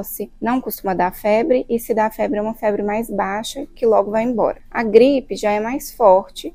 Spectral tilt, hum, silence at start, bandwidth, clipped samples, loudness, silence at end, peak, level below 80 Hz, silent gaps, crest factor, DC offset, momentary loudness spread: -5 dB/octave; none; 0 s; 16 kHz; under 0.1%; -18 LUFS; 0.05 s; 0 dBFS; -44 dBFS; none; 18 dB; under 0.1%; 9 LU